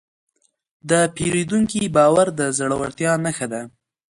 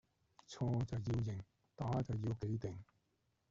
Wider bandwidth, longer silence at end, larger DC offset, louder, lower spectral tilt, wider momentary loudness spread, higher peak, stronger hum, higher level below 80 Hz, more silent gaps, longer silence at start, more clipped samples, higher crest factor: first, 11.5 kHz vs 7.6 kHz; second, 0.5 s vs 0.65 s; neither; first, -19 LUFS vs -42 LUFS; second, -4.5 dB/octave vs -8.5 dB/octave; about the same, 12 LU vs 14 LU; first, -4 dBFS vs -28 dBFS; neither; first, -52 dBFS vs -62 dBFS; neither; first, 0.85 s vs 0.5 s; neither; about the same, 18 dB vs 14 dB